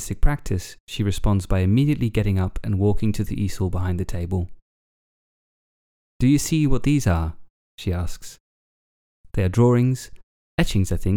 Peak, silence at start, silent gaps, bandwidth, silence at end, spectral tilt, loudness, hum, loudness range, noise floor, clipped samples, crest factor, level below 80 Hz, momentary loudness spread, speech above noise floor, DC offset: -4 dBFS; 0 s; 0.80-0.87 s, 4.62-6.20 s, 7.50-7.78 s, 8.40-9.24 s, 10.23-10.58 s; 17 kHz; 0 s; -6.5 dB/octave; -23 LUFS; none; 4 LU; under -90 dBFS; under 0.1%; 18 dB; -30 dBFS; 12 LU; over 70 dB; under 0.1%